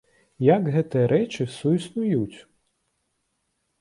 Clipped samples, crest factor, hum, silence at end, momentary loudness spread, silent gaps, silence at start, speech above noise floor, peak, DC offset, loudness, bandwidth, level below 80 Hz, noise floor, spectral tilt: under 0.1%; 20 dB; none; 1.4 s; 7 LU; none; 0.4 s; 52 dB; -4 dBFS; under 0.1%; -23 LUFS; 11.5 kHz; -62 dBFS; -75 dBFS; -8 dB/octave